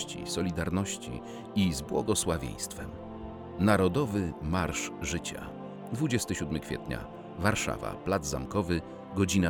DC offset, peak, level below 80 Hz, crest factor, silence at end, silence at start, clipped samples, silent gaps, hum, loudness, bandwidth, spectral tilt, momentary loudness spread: under 0.1%; -10 dBFS; -50 dBFS; 22 dB; 0 s; 0 s; under 0.1%; none; none; -31 LUFS; 19.5 kHz; -5 dB/octave; 13 LU